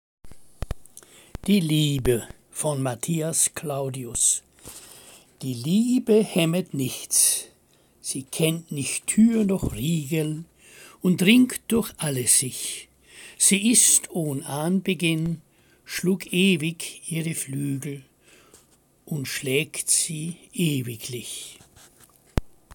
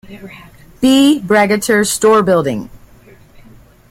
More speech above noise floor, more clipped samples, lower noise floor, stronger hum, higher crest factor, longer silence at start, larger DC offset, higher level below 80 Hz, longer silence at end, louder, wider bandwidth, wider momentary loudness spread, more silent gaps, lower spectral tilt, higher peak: first, 37 dB vs 30 dB; neither; first, -60 dBFS vs -43 dBFS; neither; first, 20 dB vs 14 dB; first, 0.25 s vs 0.1 s; neither; about the same, -46 dBFS vs -46 dBFS; second, 0.25 s vs 1.15 s; second, -23 LUFS vs -12 LUFS; about the same, 17 kHz vs 16.5 kHz; first, 18 LU vs 14 LU; neither; about the same, -3.5 dB/octave vs -4 dB/octave; second, -4 dBFS vs 0 dBFS